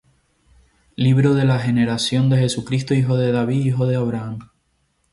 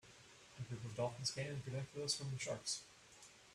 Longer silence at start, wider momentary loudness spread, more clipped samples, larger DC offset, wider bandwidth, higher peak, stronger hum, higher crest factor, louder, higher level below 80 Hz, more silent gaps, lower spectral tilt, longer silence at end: first, 1 s vs 0.05 s; second, 9 LU vs 19 LU; neither; neither; second, 11.5 kHz vs 14 kHz; first, -6 dBFS vs -24 dBFS; neither; second, 14 dB vs 22 dB; first, -19 LUFS vs -44 LUFS; first, -52 dBFS vs -74 dBFS; neither; first, -6.5 dB/octave vs -3.5 dB/octave; first, 0.65 s vs 0 s